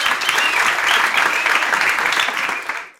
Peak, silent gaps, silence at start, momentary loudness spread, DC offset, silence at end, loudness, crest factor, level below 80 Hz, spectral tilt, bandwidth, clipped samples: 0 dBFS; none; 0 s; 5 LU; under 0.1%; 0.1 s; -16 LUFS; 18 dB; -58 dBFS; 0.5 dB/octave; 17 kHz; under 0.1%